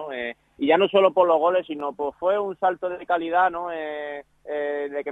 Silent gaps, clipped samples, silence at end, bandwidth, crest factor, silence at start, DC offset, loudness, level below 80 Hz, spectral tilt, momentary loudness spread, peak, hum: none; under 0.1%; 0 s; 4 kHz; 18 dB; 0 s; under 0.1%; -23 LUFS; -64 dBFS; -6.5 dB/octave; 14 LU; -4 dBFS; none